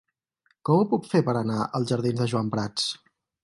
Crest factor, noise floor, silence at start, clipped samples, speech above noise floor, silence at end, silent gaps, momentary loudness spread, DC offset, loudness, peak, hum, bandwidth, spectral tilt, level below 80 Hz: 18 dB; -70 dBFS; 0.65 s; under 0.1%; 46 dB; 0.45 s; none; 6 LU; under 0.1%; -25 LUFS; -8 dBFS; none; 11.5 kHz; -6 dB/octave; -62 dBFS